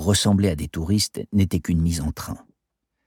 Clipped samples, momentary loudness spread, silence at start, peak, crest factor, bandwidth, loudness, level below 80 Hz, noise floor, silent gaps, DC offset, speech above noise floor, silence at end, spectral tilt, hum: under 0.1%; 13 LU; 0 s; -6 dBFS; 16 dB; 18 kHz; -22 LUFS; -38 dBFS; -79 dBFS; none; under 0.1%; 58 dB; 0.7 s; -5 dB/octave; none